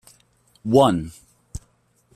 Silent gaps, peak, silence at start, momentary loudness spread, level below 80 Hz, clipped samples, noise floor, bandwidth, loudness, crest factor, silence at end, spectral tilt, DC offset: none; -2 dBFS; 0.65 s; 24 LU; -48 dBFS; under 0.1%; -62 dBFS; 14 kHz; -19 LUFS; 20 dB; 0.6 s; -6.5 dB/octave; under 0.1%